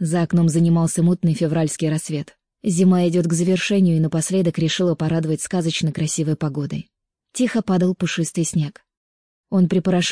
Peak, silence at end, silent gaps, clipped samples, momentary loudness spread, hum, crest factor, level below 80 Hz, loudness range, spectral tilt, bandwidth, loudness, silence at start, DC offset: -6 dBFS; 0 s; 8.97-9.44 s; under 0.1%; 8 LU; none; 12 dB; -58 dBFS; 4 LU; -6 dB/octave; 10.5 kHz; -20 LUFS; 0 s; 0.2%